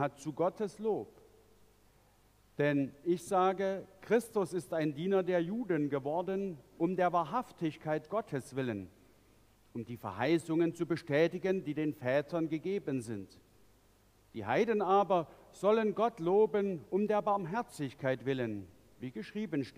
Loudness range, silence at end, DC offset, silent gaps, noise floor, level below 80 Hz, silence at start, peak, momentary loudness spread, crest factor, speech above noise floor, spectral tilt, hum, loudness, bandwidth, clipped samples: 5 LU; 0.05 s; under 0.1%; none; -66 dBFS; -72 dBFS; 0 s; -16 dBFS; 13 LU; 18 dB; 33 dB; -7 dB/octave; none; -34 LUFS; 15.5 kHz; under 0.1%